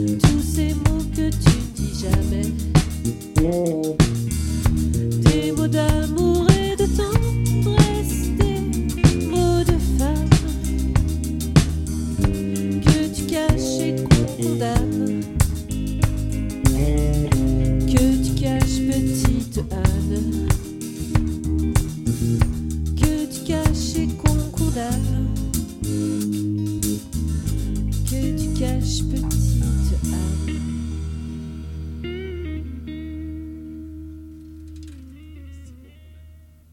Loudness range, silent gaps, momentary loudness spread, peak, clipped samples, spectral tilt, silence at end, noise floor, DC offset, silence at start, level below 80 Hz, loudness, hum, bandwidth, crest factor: 10 LU; none; 13 LU; 0 dBFS; under 0.1%; -6 dB/octave; 0.35 s; -46 dBFS; under 0.1%; 0 s; -26 dBFS; -21 LUFS; none; 17 kHz; 20 dB